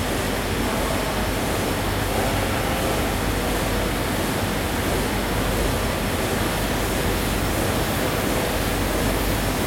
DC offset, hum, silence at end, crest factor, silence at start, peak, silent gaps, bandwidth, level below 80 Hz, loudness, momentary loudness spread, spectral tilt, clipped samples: under 0.1%; none; 0 s; 14 dB; 0 s; -8 dBFS; none; 16.5 kHz; -30 dBFS; -23 LUFS; 1 LU; -4.5 dB/octave; under 0.1%